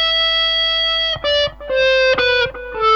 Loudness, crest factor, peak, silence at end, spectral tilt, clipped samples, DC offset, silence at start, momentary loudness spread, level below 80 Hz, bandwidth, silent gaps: -15 LUFS; 12 dB; -4 dBFS; 0 s; -2 dB/octave; under 0.1%; 0.2%; 0 s; 5 LU; -40 dBFS; 7.6 kHz; none